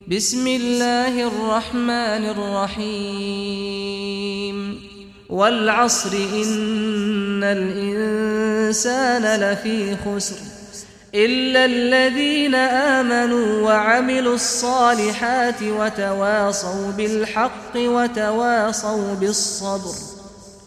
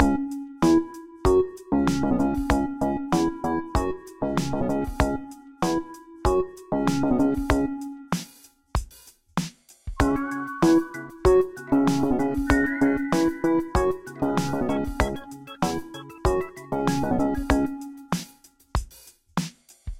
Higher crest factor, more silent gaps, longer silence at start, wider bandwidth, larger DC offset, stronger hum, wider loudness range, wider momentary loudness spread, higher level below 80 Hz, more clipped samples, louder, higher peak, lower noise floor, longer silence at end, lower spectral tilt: second, 16 dB vs 24 dB; neither; about the same, 0.05 s vs 0 s; about the same, 15 kHz vs 16 kHz; second, under 0.1% vs 0.4%; neither; about the same, 6 LU vs 5 LU; about the same, 10 LU vs 12 LU; second, -52 dBFS vs -36 dBFS; neither; first, -19 LUFS vs -25 LUFS; second, -4 dBFS vs 0 dBFS; second, -41 dBFS vs -53 dBFS; about the same, 0.1 s vs 0 s; second, -3 dB/octave vs -6 dB/octave